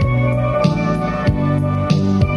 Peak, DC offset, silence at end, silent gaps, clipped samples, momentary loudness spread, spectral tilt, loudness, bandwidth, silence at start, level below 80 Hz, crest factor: -2 dBFS; under 0.1%; 0 s; none; under 0.1%; 2 LU; -8 dB/octave; -17 LUFS; 11 kHz; 0 s; -30 dBFS; 14 dB